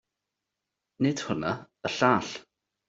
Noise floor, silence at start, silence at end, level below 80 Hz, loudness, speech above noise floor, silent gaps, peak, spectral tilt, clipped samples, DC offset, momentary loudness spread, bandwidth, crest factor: -86 dBFS; 1 s; 0.5 s; -66 dBFS; -28 LUFS; 59 dB; none; -6 dBFS; -5 dB/octave; under 0.1%; under 0.1%; 12 LU; 8 kHz; 24 dB